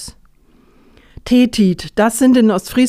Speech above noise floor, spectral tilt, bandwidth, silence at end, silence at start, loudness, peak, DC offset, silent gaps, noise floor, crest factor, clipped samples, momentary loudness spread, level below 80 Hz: 37 dB; -5.5 dB/octave; 15.5 kHz; 0 s; 0 s; -13 LUFS; -2 dBFS; under 0.1%; none; -50 dBFS; 14 dB; under 0.1%; 12 LU; -42 dBFS